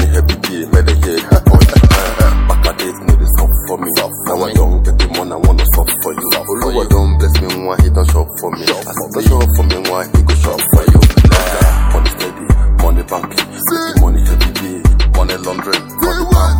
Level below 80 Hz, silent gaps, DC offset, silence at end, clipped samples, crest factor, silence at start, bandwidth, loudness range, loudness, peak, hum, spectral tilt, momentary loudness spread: -12 dBFS; none; under 0.1%; 0 s; under 0.1%; 10 dB; 0 s; 17.5 kHz; 3 LU; -12 LUFS; 0 dBFS; none; -5 dB/octave; 8 LU